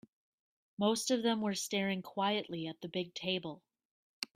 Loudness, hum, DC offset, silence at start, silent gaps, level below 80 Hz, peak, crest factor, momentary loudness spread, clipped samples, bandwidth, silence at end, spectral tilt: -35 LUFS; none; under 0.1%; 0.8 s; 3.85-4.22 s; -80 dBFS; -16 dBFS; 20 dB; 12 LU; under 0.1%; 16 kHz; 0.1 s; -4 dB/octave